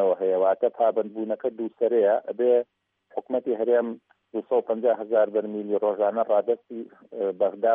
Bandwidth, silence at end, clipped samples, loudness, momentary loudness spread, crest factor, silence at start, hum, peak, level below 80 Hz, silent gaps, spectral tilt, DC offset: 3.7 kHz; 0 s; under 0.1%; -25 LUFS; 13 LU; 14 dB; 0 s; none; -10 dBFS; -84 dBFS; none; -5 dB/octave; under 0.1%